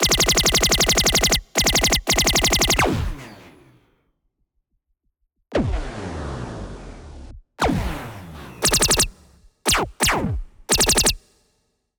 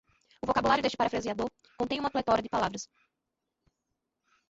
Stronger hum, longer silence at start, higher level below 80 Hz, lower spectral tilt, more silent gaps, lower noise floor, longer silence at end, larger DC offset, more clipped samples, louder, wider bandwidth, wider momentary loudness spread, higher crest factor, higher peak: neither; second, 0 s vs 0.45 s; first, -32 dBFS vs -58 dBFS; second, -2 dB/octave vs -4.5 dB/octave; neither; second, -71 dBFS vs -85 dBFS; second, 0.8 s vs 1.65 s; neither; neither; first, -18 LUFS vs -30 LUFS; first, over 20 kHz vs 8 kHz; first, 18 LU vs 12 LU; about the same, 18 dB vs 20 dB; first, -4 dBFS vs -12 dBFS